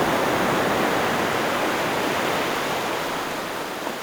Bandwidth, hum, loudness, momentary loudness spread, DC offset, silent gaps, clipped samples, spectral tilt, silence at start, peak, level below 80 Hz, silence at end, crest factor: over 20 kHz; none; -23 LUFS; 7 LU; under 0.1%; none; under 0.1%; -3.5 dB/octave; 0 s; -10 dBFS; -52 dBFS; 0 s; 14 dB